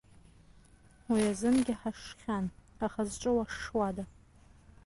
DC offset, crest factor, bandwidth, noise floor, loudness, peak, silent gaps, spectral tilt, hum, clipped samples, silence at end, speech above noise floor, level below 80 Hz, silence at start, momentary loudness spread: under 0.1%; 16 dB; 11.5 kHz; -60 dBFS; -33 LUFS; -18 dBFS; none; -5.5 dB/octave; none; under 0.1%; 0.75 s; 28 dB; -56 dBFS; 1.1 s; 12 LU